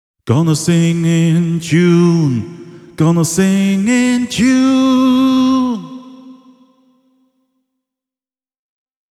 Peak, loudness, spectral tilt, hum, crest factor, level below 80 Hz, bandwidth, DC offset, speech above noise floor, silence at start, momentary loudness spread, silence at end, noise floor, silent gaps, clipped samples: 0 dBFS; -13 LUFS; -6 dB/octave; none; 14 dB; -50 dBFS; 13.5 kHz; under 0.1%; over 78 dB; 0.25 s; 7 LU; 2.8 s; under -90 dBFS; none; under 0.1%